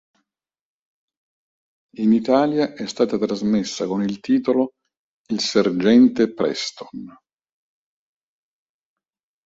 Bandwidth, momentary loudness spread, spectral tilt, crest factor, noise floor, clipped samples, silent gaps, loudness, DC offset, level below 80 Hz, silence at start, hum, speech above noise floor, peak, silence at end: 7.8 kHz; 13 LU; -5.5 dB/octave; 18 dB; -88 dBFS; under 0.1%; 4.99-5.25 s; -20 LUFS; under 0.1%; -62 dBFS; 2 s; none; 69 dB; -4 dBFS; 2.35 s